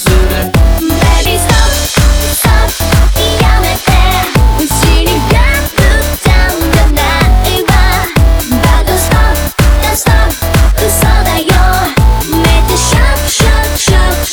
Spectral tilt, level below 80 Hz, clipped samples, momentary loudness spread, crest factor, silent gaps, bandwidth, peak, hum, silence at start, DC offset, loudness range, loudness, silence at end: -4.5 dB/octave; -10 dBFS; under 0.1%; 2 LU; 8 dB; none; over 20 kHz; 0 dBFS; none; 0 s; under 0.1%; 0 LU; -9 LUFS; 0 s